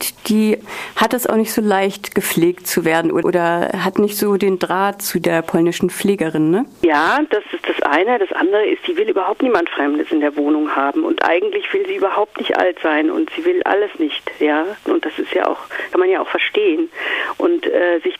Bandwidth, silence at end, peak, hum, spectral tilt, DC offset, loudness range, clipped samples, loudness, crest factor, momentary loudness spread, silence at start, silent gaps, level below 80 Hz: 15.5 kHz; 0.05 s; -2 dBFS; none; -4.5 dB/octave; under 0.1%; 2 LU; under 0.1%; -17 LUFS; 16 dB; 4 LU; 0 s; none; -58 dBFS